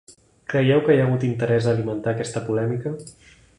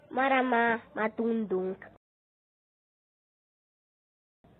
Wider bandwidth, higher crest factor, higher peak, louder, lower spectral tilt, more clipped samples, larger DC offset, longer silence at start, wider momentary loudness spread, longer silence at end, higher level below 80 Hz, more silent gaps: first, 11 kHz vs 4.2 kHz; about the same, 18 dB vs 20 dB; first, -4 dBFS vs -12 dBFS; first, -22 LUFS vs -29 LUFS; second, -7 dB/octave vs -9 dB/octave; neither; neither; about the same, 0.1 s vs 0.1 s; about the same, 11 LU vs 9 LU; second, 0.45 s vs 2.7 s; first, -56 dBFS vs -74 dBFS; neither